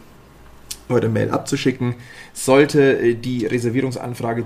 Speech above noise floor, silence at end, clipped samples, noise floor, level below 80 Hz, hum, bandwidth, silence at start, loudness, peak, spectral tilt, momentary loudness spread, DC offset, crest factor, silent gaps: 26 dB; 0 s; under 0.1%; -44 dBFS; -50 dBFS; none; 15.5 kHz; 0.45 s; -19 LUFS; 0 dBFS; -6 dB/octave; 14 LU; under 0.1%; 18 dB; none